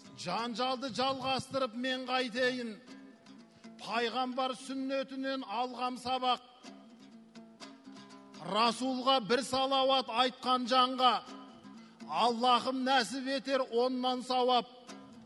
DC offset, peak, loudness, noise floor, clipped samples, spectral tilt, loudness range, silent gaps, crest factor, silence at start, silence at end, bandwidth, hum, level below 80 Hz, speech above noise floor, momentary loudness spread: under 0.1%; -14 dBFS; -32 LUFS; -56 dBFS; under 0.1%; -3.5 dB/octave; 7 LU; none; 20 dB; 0.05 s; 0 s; 12 kHz; none; -78 dBFS; 24 dB; 22 LU